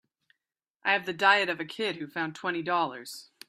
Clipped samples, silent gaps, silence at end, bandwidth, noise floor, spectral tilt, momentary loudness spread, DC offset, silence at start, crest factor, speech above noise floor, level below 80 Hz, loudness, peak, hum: under 0.1%; none; 0.25 s; 15.5 kHz; -88 dBFS; -3.5 dB/octave; 11 LU; under 0.1%; 0.85 s; 22 dB; 59 dB; -80 dBFS; -28 LUFS; -8 dBFS; none